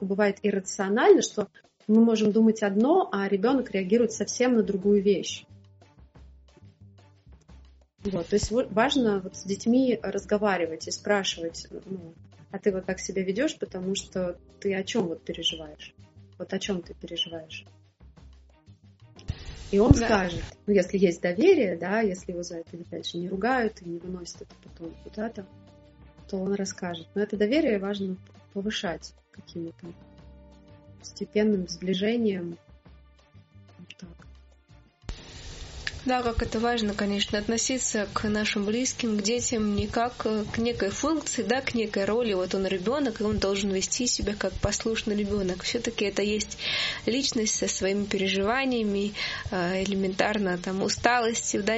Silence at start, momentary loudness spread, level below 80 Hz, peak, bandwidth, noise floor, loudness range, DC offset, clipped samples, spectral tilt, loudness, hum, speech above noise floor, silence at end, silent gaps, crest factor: 0 s; 16 LU; -46 dBFS; 0 dBFS; 8 kHz; -56 dBFS; 10 LU; under 0.1%; under 0.1%; -4 dB/octave; -26 LUFS; none; 30 dB; 0 s; none; 26 dB